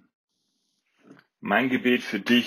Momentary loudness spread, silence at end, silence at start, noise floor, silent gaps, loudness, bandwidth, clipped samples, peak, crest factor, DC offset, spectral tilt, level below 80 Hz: 4 LU; 0 s; 1.45 s; -75 dBFS; none; -24 LUFS; 15 kHz; under 0.1%; -6 dBFS; 20 dB; under 0.1%; -5 dB/octave; -74 dBFS